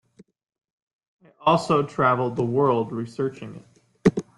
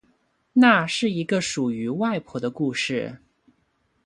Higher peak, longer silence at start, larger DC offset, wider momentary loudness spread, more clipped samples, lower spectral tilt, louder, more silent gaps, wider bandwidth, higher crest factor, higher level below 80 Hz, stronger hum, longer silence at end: about the same, -4 dBFS vs -2 dBFS; first, 1.4 s vs 0.55 s; neither; about the same, 9 LU vs 11 LU; neither; first, -7 dB/octave vs -4.5 dB/octave; about the same, -23 LUFS vs -23 LUFS; neither; about the same, 11.5 kHz vs 11.5 kHz; about the same, 20 dB vs 22 dB; first, -58 dBFS vs -64 dBFS; neither; second, 0.15 s vs 0.9 s